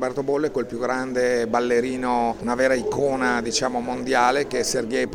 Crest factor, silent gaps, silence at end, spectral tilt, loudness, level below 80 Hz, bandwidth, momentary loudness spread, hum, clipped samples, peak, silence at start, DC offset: 16 dB; none; 0 s; -3.5 dB/octave; -22 LUFS; -50 dBFS; 17 kHz; 5 LU; none; under 0.1%; -6 dBFS; 0 s; under 0.1%